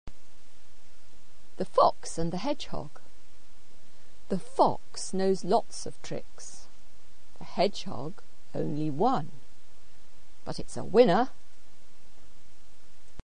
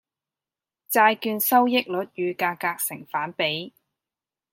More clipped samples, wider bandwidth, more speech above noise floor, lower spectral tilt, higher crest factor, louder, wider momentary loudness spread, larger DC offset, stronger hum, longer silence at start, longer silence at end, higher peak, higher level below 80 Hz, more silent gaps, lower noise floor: neither; second, 10 kHz vs 17 kHz; second, 30 dB vs over 67 dB; first, -5.5 dB/octave vs -3 dB/octave; about the same, 24 dB vs 22 dB; second, -29 LUFS vs -23 LUFS; first, 22 LU vs 10 LU; first, 4% vs under 0.1%; neither; second, 0.15 s vs 0.9 s; second, 0.15 s vs 0.85 s; about the same, -6 dBFS vs -4 dBFS; first, -56 dBFS vs -78 dBFS; neither; second, -59 dBFS vs under -90 dBFS